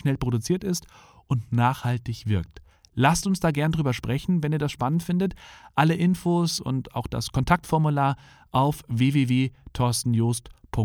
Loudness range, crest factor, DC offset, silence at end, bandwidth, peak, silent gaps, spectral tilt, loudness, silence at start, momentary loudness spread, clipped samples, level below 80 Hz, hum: 2 LU; 20 dB; under 0.1%; 0 s; 18 kHz; -4 dBFS; none; -6 dB/octave; -25 LUFS; 0.05 s; 8 LU; under 0.1%; -46 dBFS; none